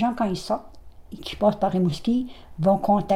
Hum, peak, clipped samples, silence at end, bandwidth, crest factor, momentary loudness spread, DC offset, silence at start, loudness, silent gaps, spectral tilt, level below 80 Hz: none; -6 dBFS; under 0.1%; 0 s; 14.5 kHz; 16 dB; 15 LU; under 0.1%; 0 s; -24 LUFS; none; -7.5 dB/octave; -48 dBFS